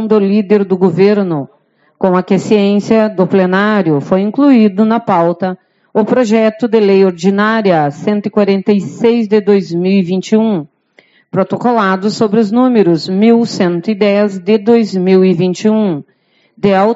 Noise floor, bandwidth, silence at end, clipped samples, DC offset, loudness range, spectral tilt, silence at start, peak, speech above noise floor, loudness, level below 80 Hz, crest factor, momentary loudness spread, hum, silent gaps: -49 dBFS; 7.8 kHz; 0 s; under 0.1%; under 0.1%; 2 LU; -7 dB/octave; 0 s; 0 dBFS; 39 dB; -11 LUFS; -58 dBFS; 10 dB; 6 LU; none; none